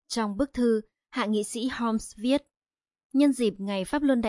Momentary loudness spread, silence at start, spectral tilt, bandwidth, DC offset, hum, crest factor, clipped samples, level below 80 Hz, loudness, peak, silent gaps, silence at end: 7 LU; 0.1 s; -5 dB/octave; 11.5 kHz; under 0.1%; none; 16 dB; under 0.1%; -56 dBFS; -27 LUFS; -10 dBFS; 3.05-3.10 s; 0 s